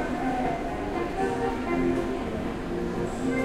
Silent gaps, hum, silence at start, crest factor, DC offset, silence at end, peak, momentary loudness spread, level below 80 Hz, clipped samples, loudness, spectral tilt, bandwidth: none; none; 0 s; 14 dB; under 0.1%; 0 s; -14 dBFS; 5 LU; -40 dBFS; under 0.1%; -29 LUFS; -6.5 dB/octave; 15 kHz